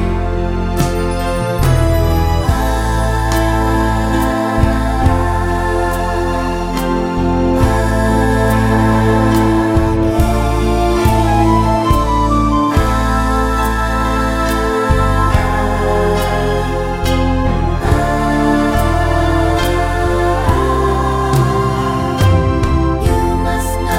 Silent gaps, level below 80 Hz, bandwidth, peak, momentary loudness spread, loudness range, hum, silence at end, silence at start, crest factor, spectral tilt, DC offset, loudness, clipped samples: none; -18 dBFS; 16.5 kHz; 0 dBFS; 4 LU; 2 LU; none; 0 s; 0 s; 12 dB; -6.5 dB/octave; 0.2%; -14 LUFS; under 0.1%